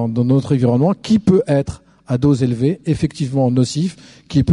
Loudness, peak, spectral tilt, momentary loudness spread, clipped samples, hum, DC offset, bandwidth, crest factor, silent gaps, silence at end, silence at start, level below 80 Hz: -17 LUFS; -2 dBFS; -7.5 dB/octave; 6 LU; under 0.1%; none; under 0.1%; 11 kHz; 14 dB; none; 0 s; 0 s; -42 dBFS